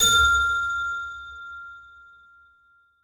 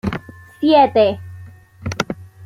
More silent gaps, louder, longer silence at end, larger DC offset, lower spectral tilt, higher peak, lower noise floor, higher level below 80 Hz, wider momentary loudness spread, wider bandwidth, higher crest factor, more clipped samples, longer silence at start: neither; second, -21 LUFS vs -16 LUFS; first, 1.25 s vs 0 s; neither; second, 0 dB/octave vs -6 dB/octave; second, -8 dBFS vs -2 dBFS; first, -61 dBFS vs -39 dBFS; about the same, -44 dBFS vs -46 dBFS; first, 23 LU vs 19 LU; first, 18 kHz vs 15 kHz; about the same, 18 dB vs 16 dB; neither; about the same, 0 s vs 0.05 s